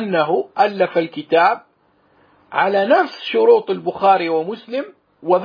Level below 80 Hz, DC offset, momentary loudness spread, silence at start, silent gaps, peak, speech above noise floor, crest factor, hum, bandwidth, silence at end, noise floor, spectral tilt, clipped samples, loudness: -72 dBFS; under 0.1%; 12 LU; 0 s; none; -2 dBFS; 42 dB; 16 dB; none; 5.2 kHz; 0 s; -58 dBFS; -7 dB/octave; under 0.1%; -17 LUFS